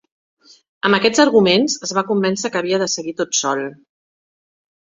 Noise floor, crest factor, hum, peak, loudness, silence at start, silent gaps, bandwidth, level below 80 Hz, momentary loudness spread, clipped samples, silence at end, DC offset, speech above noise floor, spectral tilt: under -90 dBFS; 18 dB; none; -2 dBFS; -17 LUFS; 0.85 s; none; 8.2 kHz; -60 dBFS; 9 LU; under 0.1%; 1.15 s; under 0.1%; over 73 dB; -3.5 dB/octave